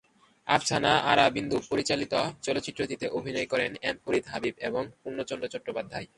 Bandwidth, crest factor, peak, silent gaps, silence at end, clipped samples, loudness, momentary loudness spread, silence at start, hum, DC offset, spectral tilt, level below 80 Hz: 11.5 kHz; 24 dB; -6 dBFS; none; 0.15 s; under 0.1%; -28 LUFS; 12 LU; 0.45 s; none; under 0.1%; -3.5 dB/octave; -60 dBFS